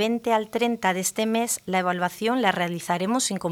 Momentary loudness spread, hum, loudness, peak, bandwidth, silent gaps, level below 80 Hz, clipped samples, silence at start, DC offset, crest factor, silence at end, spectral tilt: 3 LU; none; -24 LUFS; -6 dBFS; 20 kHz; none; -68 dBFS; under 0.1%; 0 s; under 0.1%; 20 dB; 0 s; -3.5 dB/octave